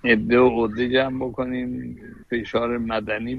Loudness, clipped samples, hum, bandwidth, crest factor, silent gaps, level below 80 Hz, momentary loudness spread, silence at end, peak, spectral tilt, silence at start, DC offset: -22 LUFS; under 0.1%; none; 6.6 kHz; 16 dB; none; -46 dBFS; 13 LU; 0 s; -6 dBFS; -7.5 dB/octave; 0.05 s; under 0.1%